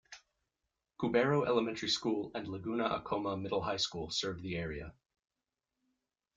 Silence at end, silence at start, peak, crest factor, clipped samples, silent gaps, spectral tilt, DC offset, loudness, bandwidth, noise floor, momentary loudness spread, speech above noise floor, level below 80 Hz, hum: 1.45 s; 0.1 s; -16 dBFS; 20 dB; under 0.1%; none; -4.5 dB/octave; under 0.1%; -35 LUFS; 9.4 kHz; -90 dBFS; 11 LU; 55 dB; -62 dBFS; none